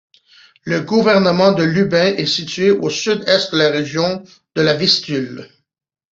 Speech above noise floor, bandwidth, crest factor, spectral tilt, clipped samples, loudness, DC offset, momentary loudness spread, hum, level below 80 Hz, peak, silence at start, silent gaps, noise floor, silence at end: 33 dB; 8 kHz; 16 dB; -5 dB/octave; under 0.1%; -15 LUFS; under 0.1%; 10 LU; none; -56 dBFS; -2 dBFS; 0.65 s; none; -49 dBFS; 0.7 s